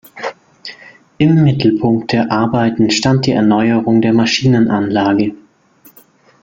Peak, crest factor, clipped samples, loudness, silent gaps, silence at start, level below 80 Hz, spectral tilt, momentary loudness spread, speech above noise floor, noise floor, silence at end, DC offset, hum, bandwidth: 0 dBFS; 14 dB; under 0.1%; -13 LUFS; none; 0.15 s; -48 dBFS; -6 dB/octave; 15 LU; 36 dB; -48 dBFS; 1.05 s; under 0.1%; none; 16.5 kHz